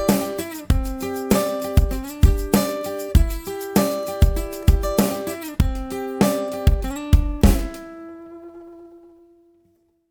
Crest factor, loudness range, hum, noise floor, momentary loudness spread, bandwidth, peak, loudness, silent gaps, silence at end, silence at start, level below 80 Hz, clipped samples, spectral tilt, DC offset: 20 dB; 3 LU; none; -62 dBFS; 18 LU; over 20 kHz; -2 dBFS; -22 LUFS; none; 1.15 s; 0 s; -24 dBFS; under 0.1%; -6 dB/octave; under 0.1%